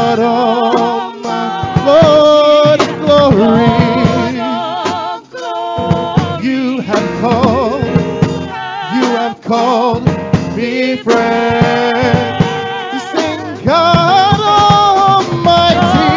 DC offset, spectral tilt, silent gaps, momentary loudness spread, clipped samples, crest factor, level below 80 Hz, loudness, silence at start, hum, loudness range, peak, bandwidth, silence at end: under 0.1%; -6 dB/octave; none; 10 LU; under 0.1%; 10 dB; -34 dBFS; -11 LUFS; 0 s; none; 5 LU; 0 dBFS; 7.6 kHz; 0 s